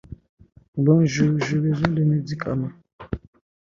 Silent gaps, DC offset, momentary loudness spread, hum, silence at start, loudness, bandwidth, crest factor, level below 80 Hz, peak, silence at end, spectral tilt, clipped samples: 0.29-0.37 s, 0.68-0.73 s, 2.93-2.99 s; under 0.1%; 17 LU; none; 0.1 s; -21 LUFS; 7.4 kHz; 18 dB; -48 dBFS; -4 dBFS; 0.45 s; -7.5 dB/octave; under 0.1%